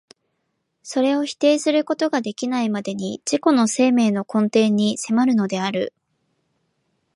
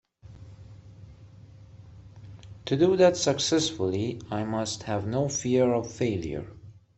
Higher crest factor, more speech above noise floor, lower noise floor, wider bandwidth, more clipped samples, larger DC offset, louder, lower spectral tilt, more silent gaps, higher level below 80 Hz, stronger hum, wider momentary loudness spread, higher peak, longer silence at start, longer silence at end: about the same, 18 dB vs 20 dB; first, 54 dB vs 24 dB; first, -73 dBFS vs -49 dBFS; first, 11.5 kHz vs 8.4 kHz; neither; neither; first, -20 LUFS vs -26 LUFS; about the same, -5 dB/octave vs -5 dB/octave; neither; second, -72 dBFS vs -56 dBFS; neither; second, 8 LU vs 24 LU; first, -4 dBFS vs -8 dBFS; first, 0.85 s vs 0.25 s; first, 1.25 s vs 0.25 s